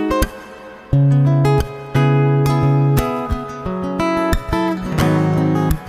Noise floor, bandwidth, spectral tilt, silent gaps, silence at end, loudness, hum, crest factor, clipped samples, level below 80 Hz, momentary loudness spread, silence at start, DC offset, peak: -36 dBFS; 15.5 kHz; -7.5 dB/octave; none; 0 s; -17 LUFS; none; 14 dB; under 0.1%; -30 dBFS; 10 LU; 0 s; under 0.1%; -2 dBFS